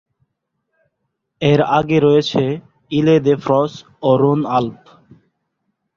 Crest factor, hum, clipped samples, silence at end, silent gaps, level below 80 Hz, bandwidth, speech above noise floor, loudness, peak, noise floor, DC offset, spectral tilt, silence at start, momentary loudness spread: 16 dB; none; under 0.1%; 1.25 s; none; -54 dBFS; 7.2 kHz; 59 dB; -16 LUFS; -2 dBFS; -74 dBFS; under 0.1%; -7.5 dB/octave; 1.4 s; 9 LU